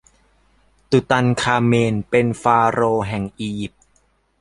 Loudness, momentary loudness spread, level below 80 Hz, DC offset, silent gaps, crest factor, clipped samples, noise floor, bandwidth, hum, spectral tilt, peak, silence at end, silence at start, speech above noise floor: -18 LUFS; 11 LU; -48 dBFS; under 0.1%; none; 18 dB; under 0.1%; -61 dBFS; 11.5 kHz; none; -6 dB/octave; -2 dBFS; 0.75 s; 0.9 s; 44 dB